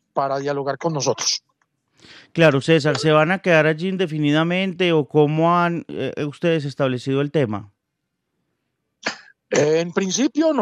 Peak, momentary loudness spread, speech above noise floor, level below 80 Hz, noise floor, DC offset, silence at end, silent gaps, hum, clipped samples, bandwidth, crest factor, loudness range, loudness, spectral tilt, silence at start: -2 dBFS; 10 LU; 58 dB; -68 dBFS; -77 dBFS; under 0.1%; 0 s; none; none; under 0.1%; 11 kHz; 18 dB; 7 LU; -20 LUFS; -5 dB/octave; 0.15 s